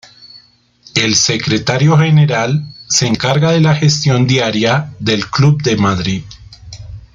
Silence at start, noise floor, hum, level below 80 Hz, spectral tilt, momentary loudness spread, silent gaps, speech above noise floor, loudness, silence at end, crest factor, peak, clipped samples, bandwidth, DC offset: 0.35 s; -47 dBFS; none; -44 dBFS; -4.5 dB/octave; 8 LU; none; 35 dB; -13 LUFS; 0.15 s; 14 dB; 0 dBFS; under 0.1%; 7.6 kHz; under 0.1%